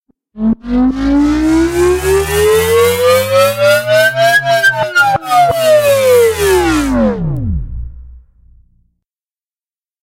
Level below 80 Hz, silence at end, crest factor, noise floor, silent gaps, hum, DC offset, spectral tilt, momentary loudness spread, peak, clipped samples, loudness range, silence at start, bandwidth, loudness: -28 dBFS; 1.9 s; 12 dB; under -90 dBFS; none; none; under 0.1%; -4.5 dB/octave; 9 LU; 0 dBFS; under 0.1%; 7 LU; 0.35 s; 16 kHz; -11 LUFS